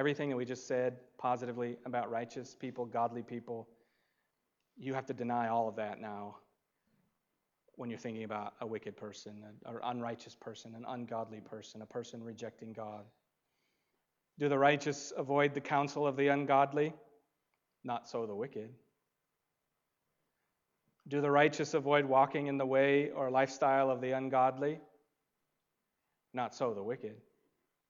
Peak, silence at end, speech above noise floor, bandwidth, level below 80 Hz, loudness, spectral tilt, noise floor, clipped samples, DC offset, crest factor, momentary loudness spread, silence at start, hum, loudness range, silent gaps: -14 dBFS; 0.7 s; 51 dB; 7.6 kHz; -88 dBFS; -35 LUFS; -5.5 dB/octave; -86 dBFS; under 0.1%; under 0.1%; 22 dB; 18 LU; 0 s; none; 15 LU; none